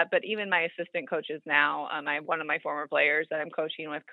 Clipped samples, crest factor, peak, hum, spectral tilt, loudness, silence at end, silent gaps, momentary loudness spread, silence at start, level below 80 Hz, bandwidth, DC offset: under 0.1%; 22 dB; -8 dBFS; none; -6.5 dB/octave; -28 LUFS; 0 s; none; 9 LU; 0 s; under -90 dBFS; 4.9 kHz; under 0.1%